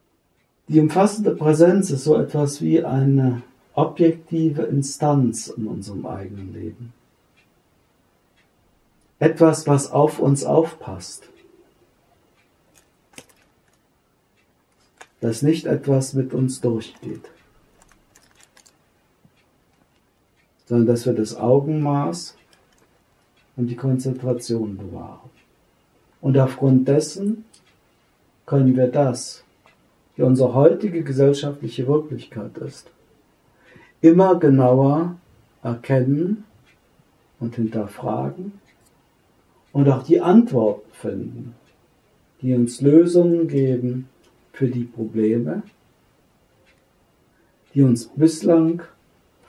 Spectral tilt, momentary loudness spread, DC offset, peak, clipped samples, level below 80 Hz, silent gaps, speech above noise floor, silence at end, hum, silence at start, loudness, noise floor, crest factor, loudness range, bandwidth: -7.5 dB/octave; 19 LU; under 0.1%; 0 dBFS; under 0.1%; -66 dBFS; none; 47 dB; 0.6 s; none; 0.7 s; -19 LUFS; -65 dBFS; 20 dB; 9 LU; 12.5 kHz